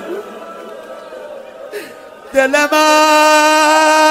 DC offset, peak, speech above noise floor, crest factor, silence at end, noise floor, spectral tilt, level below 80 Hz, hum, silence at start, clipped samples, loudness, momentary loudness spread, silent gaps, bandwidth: under 0.1%; 0 dBFS; 24 dB; 14 dB; 0 s; -34 dBFS; -0.5 dB/octave; -60 dBFS; none; 0 s; under 0.1%; -10 LUFS; 23 LU; none; 16.5 kHz